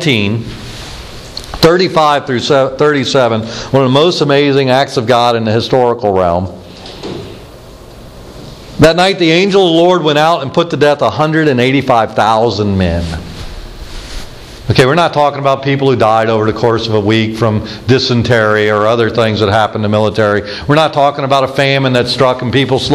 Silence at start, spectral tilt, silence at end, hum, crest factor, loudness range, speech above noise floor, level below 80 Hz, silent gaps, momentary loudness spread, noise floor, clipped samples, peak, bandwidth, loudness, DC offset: 0 s; -6 dB/octave; 0 s; none; 12 dB; 4 LU; 22 dB; -34 dBFS; none; 18 LU; -33 dBFS; 0.3%; 0 dBFS; 14.5 kHz; -11 LUFS; under 0.1%